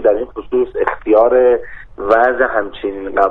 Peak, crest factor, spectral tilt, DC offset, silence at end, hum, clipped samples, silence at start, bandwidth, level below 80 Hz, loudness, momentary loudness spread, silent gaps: 0 dBFS; 14 dB; -7 dB/octave; under 0.1%; 0 s; none; under 0.1%; 0 s; 4.5 kHz; -40 dBFS; -15 LUFS; 12 LU; none